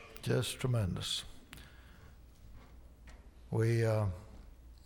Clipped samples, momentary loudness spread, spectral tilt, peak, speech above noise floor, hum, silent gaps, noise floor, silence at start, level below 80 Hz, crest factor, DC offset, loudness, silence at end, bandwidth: under 0.1%; 26 LU; -5.5 dB/octave; -20 dBFS; 23 dB; none; none; -56 dBFS; 0 s; -54 dBFS; 16 dB; under 0.1%; -35 LUFS; 0 s; 19 kHz